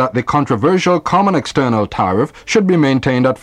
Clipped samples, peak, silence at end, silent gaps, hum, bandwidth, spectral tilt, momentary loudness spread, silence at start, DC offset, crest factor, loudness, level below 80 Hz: under 0.1%; -2 dBFS; 0.05 s; none; none; 11 kHz; -6 dB/octave; 3 LU; 0 s; under 0.1%; 12 dB; -14 LUFS; -44 dBFS